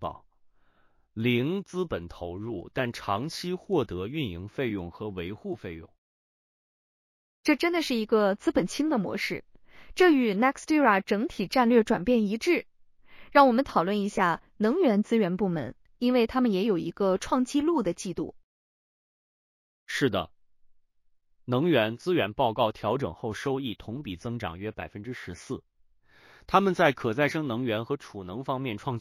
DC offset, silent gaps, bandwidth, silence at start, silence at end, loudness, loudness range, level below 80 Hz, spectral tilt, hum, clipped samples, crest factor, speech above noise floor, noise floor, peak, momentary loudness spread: under 0.1%; 5.98-7.44 s, 18.44-19.86 s; 15.5 kHz; 0 s; 0 s; -27 LUFS; 9 LU; -56 dBFS; -6 dB/octave; none; under 0.1%; 22 dB; 39 dB; -65 dBFS; -6 dBFS; 15 LU